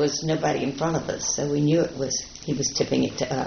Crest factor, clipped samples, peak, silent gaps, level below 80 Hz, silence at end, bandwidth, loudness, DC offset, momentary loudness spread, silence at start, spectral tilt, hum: 14 dB; under 0.1%; -10 dBFS; none; -50 dBFS; 0 s; 6.6 kHz; -25 LUFS; under 0.1%; 5 LU; 0 s; -5 dB/octave; none